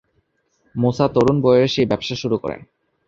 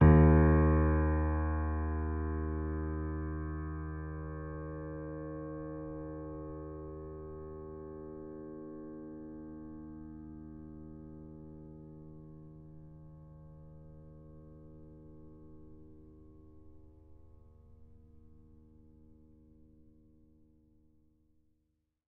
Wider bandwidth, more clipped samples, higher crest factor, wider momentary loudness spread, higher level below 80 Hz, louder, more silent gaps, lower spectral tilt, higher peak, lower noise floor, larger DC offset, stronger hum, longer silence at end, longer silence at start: first, 7.6 kHz vs 3 kHz; neither; second, 16 dB vs 24 dB; second, 14 LU vs 25 LU; second, -48 dBFS vs -40 dBFS; first, -18 LUFS vs -34 LUFS; neither; second, -7 dB/octave vs -10.5 dB/octave; first, -2 dBFS vs -12 dBFS; second, -66 dBFS vs -80 dBFS; neither; neither; second, 0.5 s vs 3.7 s; first, 0.75 s vs 0 s